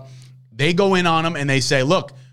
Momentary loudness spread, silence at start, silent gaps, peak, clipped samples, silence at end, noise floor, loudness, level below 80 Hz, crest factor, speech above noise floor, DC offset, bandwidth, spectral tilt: 4 LU; 0 s; none; -4 dBFS; under 0.1%; 0 s; -43 dBFS; -18 LUFS; -52 dBFS; 16 dB; 24 dB; under 0.1%; 15 kHz; -5 dB/octave